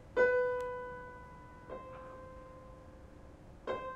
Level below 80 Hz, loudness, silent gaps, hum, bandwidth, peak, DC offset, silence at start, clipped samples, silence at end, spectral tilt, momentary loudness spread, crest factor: -58 dBFS; -36 LUFS; none; none; 8.4 kHz; -16 dBFS; under 0.1%; 0 s; under 0.1%; 0 s; -6 dB/octave; 25 LU; 22 dB